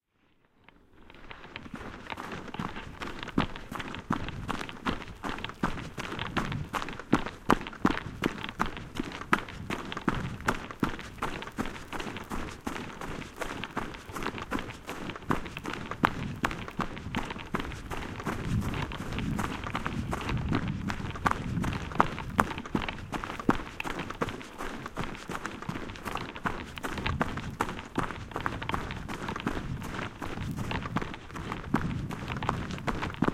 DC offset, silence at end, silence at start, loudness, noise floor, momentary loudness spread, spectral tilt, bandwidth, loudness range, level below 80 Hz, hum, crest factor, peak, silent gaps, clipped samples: under 0.1%; 0 s; 0.95 s; -34 LUFS; -68 dBFS; 9 LU; -5.5 dB/octave; 16.5 kHz; 5 LU; -44 dBFS; none; 32 dB; -2 dBFS; none; under 0.1%